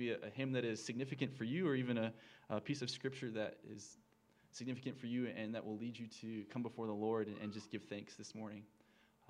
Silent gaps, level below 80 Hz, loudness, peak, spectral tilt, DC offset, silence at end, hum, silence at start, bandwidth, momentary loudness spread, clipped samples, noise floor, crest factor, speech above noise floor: none; -88 dBFS; -44 LUFS; -24 dBFS; -5.5 dB/octave; under 0.1%; 0.6 s; none; 0 s; 11 kHz; 12 LU; under 0.1%; -72 dBFS; 20 dB; 29 dB